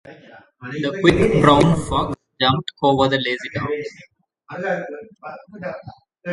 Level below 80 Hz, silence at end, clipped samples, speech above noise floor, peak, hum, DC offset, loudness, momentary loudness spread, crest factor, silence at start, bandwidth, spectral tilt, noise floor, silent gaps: -42 dBFS; 0 s; under 0.1%; 27 dB; 0 dBFS; none; under 0.1%; -19 LUFS; 22 LU; 20 dB; 0.05 s; 11.5 kHz; -6 dB/octave; -46 dBFS; none